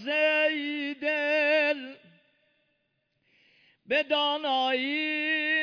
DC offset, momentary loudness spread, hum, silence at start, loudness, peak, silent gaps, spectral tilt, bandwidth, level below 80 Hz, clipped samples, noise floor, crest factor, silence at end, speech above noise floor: under 0.1%; 7 LU; none; 0 s; -26 LUFS; -14 dBFS; none; -3 dB/octave; 5.4 kHz; -82 dBFS; under 0.1%; -76 dBFS; 14 dB; 0 s; 49 dB